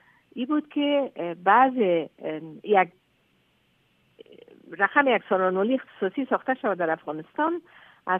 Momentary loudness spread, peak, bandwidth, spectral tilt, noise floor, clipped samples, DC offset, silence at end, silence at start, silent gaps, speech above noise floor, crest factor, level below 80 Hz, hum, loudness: 14 LU; -4 dBFS; 3.8 kHz; -8 dB/octave; -66 dBFS; under 0.1%; under 0.1%; 0 s; 0.35 s; none; 42 dB; 22 dB; -82 dBFS; none; -25 LUFS